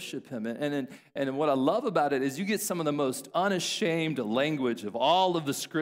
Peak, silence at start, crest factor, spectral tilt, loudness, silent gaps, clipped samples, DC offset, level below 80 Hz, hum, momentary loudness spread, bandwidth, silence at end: -12 dBFS; 0 s; 18 dB; -4.5 dB/octave; -29 LUFS; none; under 0.1%; under 0.1%; -76 dBFS; none; 8 LU; 16 kHz; 0 s